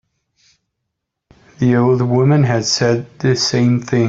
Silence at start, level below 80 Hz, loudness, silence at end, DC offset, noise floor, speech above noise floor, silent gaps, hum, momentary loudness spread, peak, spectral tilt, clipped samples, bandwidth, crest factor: 1.6 s; -52 dBFS; -15 LUFS; 0 s; under 0.1%; -77 dBFS; 63 dB; none; none; 5 LU; -2 dBFS; -5.5 dB/octave; under 0.1%; 7.8 kHz; 14 dB